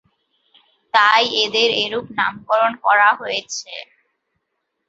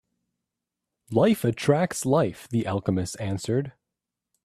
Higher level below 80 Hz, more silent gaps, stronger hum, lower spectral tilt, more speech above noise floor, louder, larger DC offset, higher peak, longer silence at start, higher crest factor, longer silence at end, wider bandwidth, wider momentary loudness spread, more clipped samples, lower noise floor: second, -66 dBFS vs -60 dBFS; neither; neither; second, -1.5 dB/octave vs -6 dB/octave; second, 57 dB vs 62 dB; first, -17 LUFS vs -25 LUFS; neither; first, -2 dBFS vs -6 dBFS; second, 0.95 s vs 1.1 s; about the same, 18 dB vs 20 dB; first, 1.05 s vs 0.75 s; second, 8 kHz vs 15 kHz; first, 14 LU vs 7 LU; neither; second, -75 dBFS vs -86 dBFS